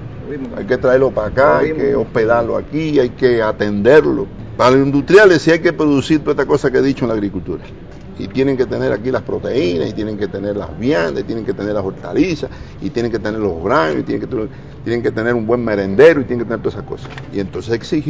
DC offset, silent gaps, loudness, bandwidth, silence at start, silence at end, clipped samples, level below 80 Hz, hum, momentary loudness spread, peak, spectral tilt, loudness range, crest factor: 0.8%; none; -15 LUFS; 8 kHz; 0 s; 0 s; 0.3%; -38 dBFS; none; 15 LU; 0 dBFS; -7 dB/octave; 7 LU; 16 dB